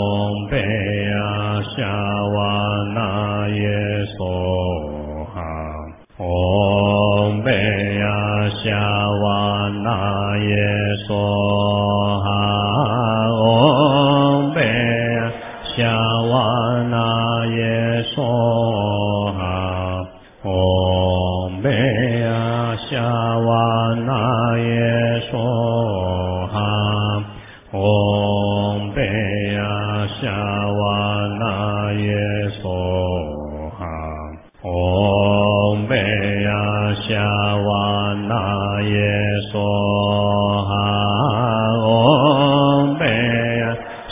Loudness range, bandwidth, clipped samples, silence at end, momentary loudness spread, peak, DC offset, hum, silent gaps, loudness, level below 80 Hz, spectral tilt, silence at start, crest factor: 5 LU; 3.8 kHz; under 0.1%; 0 s; 8 LU; 0 dBFS; under 0.1%; none; none; -18 LUFS; -36 dBFS; -11 dB/octave; 0 s; 18 dB